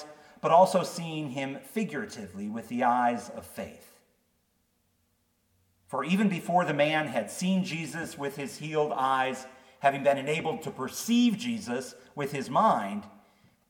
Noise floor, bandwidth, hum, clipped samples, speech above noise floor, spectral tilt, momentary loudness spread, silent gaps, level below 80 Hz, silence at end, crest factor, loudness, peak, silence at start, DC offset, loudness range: -73 dBFS; 18 kHz; none; under 0.1%; 44 dB; -5 dB/octave; 14 LU; none; -74 dBFS; 0.6 s; 20 dB; -28 LUFS; -8 dBFS; 0 s; under 0.1%; 5 LU